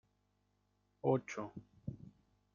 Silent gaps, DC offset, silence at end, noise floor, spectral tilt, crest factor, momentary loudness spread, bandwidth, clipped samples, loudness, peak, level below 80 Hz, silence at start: none; under 0.1%; 0.45 s; -79 dBFS; -7.5 dB/octave; 24 dB; 19 LU; 7.2 kHz; under 0.1%; -41 LUFS; -18 dBFS; -72 dBFS; 1.05 s